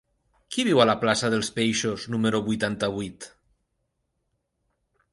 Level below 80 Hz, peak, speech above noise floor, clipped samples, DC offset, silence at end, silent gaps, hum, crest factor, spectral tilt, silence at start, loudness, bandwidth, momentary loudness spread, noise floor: -60 dBFS; -6 dBFS; 52 dB; under 0.1%; under 0.1%; 1.85 s; none; none; 22 dB; -4.5 dB/octave; 0.5 s; -24 LUFS; 11.5 kHz; 14 LU; -76 dBFS